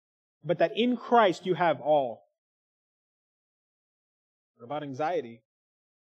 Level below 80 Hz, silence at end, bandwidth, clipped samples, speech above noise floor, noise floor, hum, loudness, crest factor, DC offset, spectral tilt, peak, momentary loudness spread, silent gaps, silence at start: -90 dBFS; 0.75 s; 8.6 kHz; under 0.1%; over 63 dB; under -90 dBFS; none; -27 LUFS; 22 dB; under 0.1%; -6 dB/octave; -8 dBFS; 16 LU; 2.38-4.54 s; 0.45 s